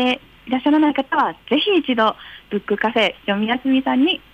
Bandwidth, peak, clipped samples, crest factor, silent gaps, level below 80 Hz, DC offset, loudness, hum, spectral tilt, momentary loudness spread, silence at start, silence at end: 8.2 kHz; -6 dBFS; under 0.1%; 12 dB; none; -56 dBFS; under 0.1%; -19 LUFS; none; -6 dB/octave; 9 LU; 0 s; 0.15 s